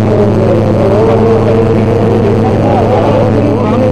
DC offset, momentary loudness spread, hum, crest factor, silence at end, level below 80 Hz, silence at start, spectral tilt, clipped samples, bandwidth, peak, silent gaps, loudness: 4%; 1 LU; none; 8 dB; 0 s; -26 dBFS; 0 s; -9 dB/octave; under 0.1%; 10 kHz; 0 dBFS; none; -9 LUFS